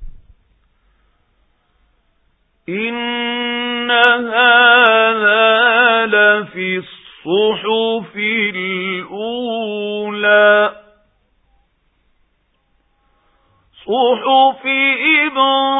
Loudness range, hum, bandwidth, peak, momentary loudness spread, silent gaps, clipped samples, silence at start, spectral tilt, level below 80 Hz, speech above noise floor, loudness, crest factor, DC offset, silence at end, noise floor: 12 LU; none; 4 kHz; 0 dBFS; 12 LU; none; under 0.1%; 0 s; -6 dB/octave; -52 dBFS; 48 dB; -13 LUFS; 16 dB; under 0.1%; 0 s; -62 dBFS